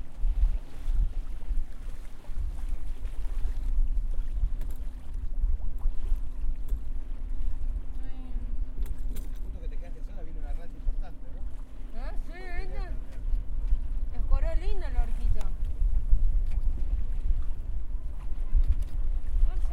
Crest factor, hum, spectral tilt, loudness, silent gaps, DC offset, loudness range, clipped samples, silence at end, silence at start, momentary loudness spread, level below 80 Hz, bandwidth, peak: 18 dB; none; -7.5 dB/octave; -36 LUFS; none; under 0.1%; 7 LU; under 0.1%; 0 s; 0 s; 10 LU; -28 dBFS; 3.2 kHz; -8 dBFS